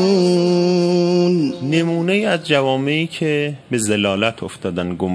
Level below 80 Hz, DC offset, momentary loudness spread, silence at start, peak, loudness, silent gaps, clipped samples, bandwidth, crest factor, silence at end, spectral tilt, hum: -58 dBFS; under 0.1%; 7 LU; 0 s; 0 dBFS; -17 LUFS; none; under 0.1%; 11 kHz; 16 dB; 0 s; -5.5 dB/octave; none